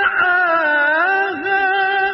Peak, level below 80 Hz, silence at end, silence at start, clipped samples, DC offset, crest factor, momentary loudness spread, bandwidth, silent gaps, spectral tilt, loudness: -4 dBFS; -58 dBFS; 0 s; 0 s; under 0.1%; under 0.1%; 12 dB; 3 LU; 5.8 kHz; none; -7 dB/octave; -15 LUFS